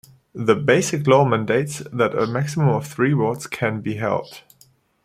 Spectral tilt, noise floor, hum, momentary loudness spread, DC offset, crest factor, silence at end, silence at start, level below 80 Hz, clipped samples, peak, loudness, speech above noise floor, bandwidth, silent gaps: -6 dB/octave; -56 dBFS; none; 9 LU; under 0.1%; 18 dB; 0.65 s; 0.35 s; -58 dBFS; under 0.1%; -2 dBFS; -20 LUFS; 37 dB; 15.5 kHz; none